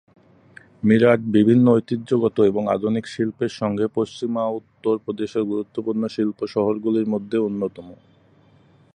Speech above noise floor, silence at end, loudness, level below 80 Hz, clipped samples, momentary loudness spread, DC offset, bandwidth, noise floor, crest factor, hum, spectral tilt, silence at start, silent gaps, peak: 34 dB; 1 s; -21 LUFS; -60 dBFS; under 0.1%; 10 LU; under 0.1%; 9.8 kHz; -55 dBFS; 18 dB; none; -8 dB/octave; 0.85 s; none; -2 dBFS